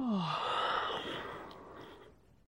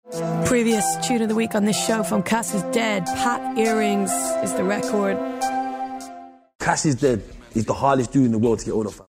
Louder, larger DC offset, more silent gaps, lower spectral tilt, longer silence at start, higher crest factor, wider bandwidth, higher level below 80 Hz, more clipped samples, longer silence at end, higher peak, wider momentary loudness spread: second, -36 LUFS vs -22 LUFS; neither; second, none vs 6.55-6.59 s; about the same, -5.5 dB/octave vs -4.5 dB/octave; about the same, 0 s vs 0.05 s; about the same, 16 dB vs 18 dB; about the same, 16 kHz vs 16 kHz; second, -68 dBFS vs -50 dBFS; neither; first, 0.35 s vs 0.05 s; second, -22 dBFS vs -4 dBFS; first, 19 LU vs 8 LU